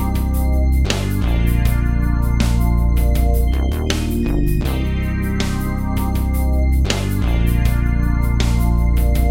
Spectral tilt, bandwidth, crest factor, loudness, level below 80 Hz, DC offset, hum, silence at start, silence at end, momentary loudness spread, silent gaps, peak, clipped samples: -6.5 dB/octave; 16.5 kHz; 14 dB; -19 LUFS; -18 dBFS; under 0.1%; none; 0 s; 0 s; 3 LU; none; -2 dBFS; under 0.1%